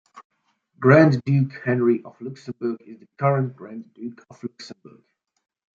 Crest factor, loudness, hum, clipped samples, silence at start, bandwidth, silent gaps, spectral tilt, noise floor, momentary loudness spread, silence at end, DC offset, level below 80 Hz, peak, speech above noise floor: 22 dB; -20 LUFS; none; under 0.1%; 0.15 s; 7.2 kHz; 0.25-0.30 s; -9 dB/octave; -61 dBFS; 22 LU; 1.05 s; under 0.1%; -64 dBFS; -2 dBFS; 39 dB